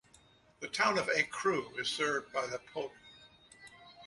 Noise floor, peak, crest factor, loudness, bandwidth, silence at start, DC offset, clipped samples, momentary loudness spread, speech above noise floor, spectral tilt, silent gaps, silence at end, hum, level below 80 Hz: -64 dBFS; -16 dBFS; 20 dB; -34 LUFS; 11.5 kHz; 0.6 s; under 0.1%; under 0.1%; 23 LU; 30 dB; -2.5 dB/octave; none; 0 s; none; -74 dBFS